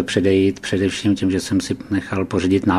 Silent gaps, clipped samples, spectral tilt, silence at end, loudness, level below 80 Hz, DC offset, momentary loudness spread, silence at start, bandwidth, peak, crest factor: none; under 0.1%; -5.5 dB/octave; 0 s; -19 LUFS; -48 dBFS; under 0.1%; 6 LU; 0 s; 13.5 kHz; -2 dBFS; 16 dB